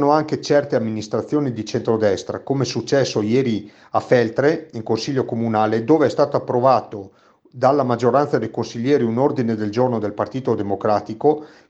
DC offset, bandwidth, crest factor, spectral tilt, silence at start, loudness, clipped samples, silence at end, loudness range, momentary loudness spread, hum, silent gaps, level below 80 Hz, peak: under 0.1%; 8.2 kHz; 18 dB; -6.5 dB/octave; 0 s; -20 LUFS; under 0.1%; 0.2 s; 2 LU; 7 LU; none; none; -62 dBFS; -2 dBFS